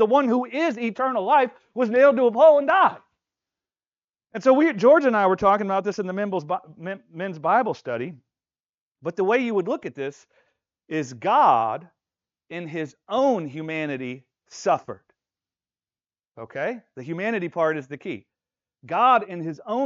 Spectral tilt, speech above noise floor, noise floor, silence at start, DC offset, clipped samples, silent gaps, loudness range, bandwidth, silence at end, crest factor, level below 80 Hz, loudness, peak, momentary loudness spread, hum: -4 dB/octave; over 68 dB; under -90 dBFS; 0 s; under 0.1%; under 0.1%; 4.04-4.08 s, 8.60-8.91 s; 10 LU; 7.6 kHz; 0 s; 18 dB; -68 dBFS; -22 LUFS; -6 dBFS; 18 LU; none